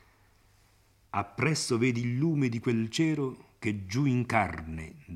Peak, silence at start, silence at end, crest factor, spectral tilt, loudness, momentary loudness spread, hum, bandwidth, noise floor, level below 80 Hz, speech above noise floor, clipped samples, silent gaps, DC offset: -10 dBFS; 1.15 s; 0 s; 20 dB; -5.5 dB/octave; -29 LUFS; 9 LU; none; 14 kHz; -64 dBFS; -58 dBFS; 35 dB; under 0.1%; none; under 0.1%